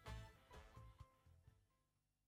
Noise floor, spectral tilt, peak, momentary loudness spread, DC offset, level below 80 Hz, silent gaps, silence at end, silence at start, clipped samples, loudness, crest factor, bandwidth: -87 dBFS; -5 dB/octave; -42 dBFS; 10 LU; under 0.1%; -66 dBFS; none; 0.3 s; 0 s; under 0.1%; -63 LUFS; 20 dB; 16.5 kHz